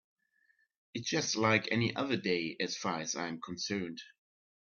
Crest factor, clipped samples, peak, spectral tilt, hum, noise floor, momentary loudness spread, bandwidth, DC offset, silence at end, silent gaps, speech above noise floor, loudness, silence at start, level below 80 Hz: 24 dB; under 0.1%; -12 dBFS; -3.5 dB/octave; none; -74 dBFS; 11 LU; 7.4 kHz; under 0.1%; 0.55 s; none; 40 dB; -33 LUFS; 0.95 s; -74 dBFS